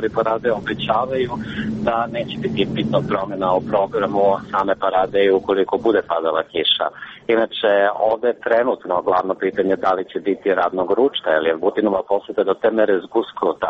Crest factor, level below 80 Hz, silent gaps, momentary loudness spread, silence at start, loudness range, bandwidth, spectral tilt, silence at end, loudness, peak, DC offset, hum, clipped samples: 14 dB; -52 dBFS; none; 6 LU; 0 s; 3 LU; 7.4 kHz; -7 dB/octave; 0 s; -19 LUFS; -4 dBFS; under 0.1%; none; under 0.1%